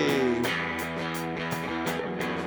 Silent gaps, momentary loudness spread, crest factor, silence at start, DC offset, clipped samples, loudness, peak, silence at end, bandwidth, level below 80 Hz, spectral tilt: none; 6 LU; 16 dB; 0 s; under 0.1%; under 0.1%; -29 LUFS; -12 dBFS; 0 s; over 20 kHz; -56 dBFS; -5 dB/octave